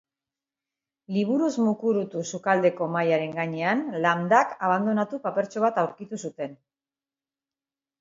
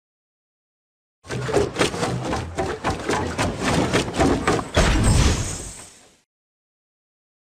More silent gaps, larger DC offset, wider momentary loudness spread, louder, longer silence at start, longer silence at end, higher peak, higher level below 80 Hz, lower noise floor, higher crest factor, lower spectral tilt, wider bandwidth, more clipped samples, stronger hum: neither; neither; about the same, 11 LU vs 11 LU; second, -25 LUFS vs -22 LUFS; second, 1.1 s vs 1.25 s; second, 1.45 s vs 1.65 s; about the same, -4 dBFS vs -6 dBFS; second, -76 dBFS vs -30 dBFS; first, under -90 dBFS vs -45 dBFS; about the same, 22 dB vs 18 dB; first, -6 dB/octave vs -4.5 dB/octave; second, 7.8 kHz vs 15 kHz; neither; neither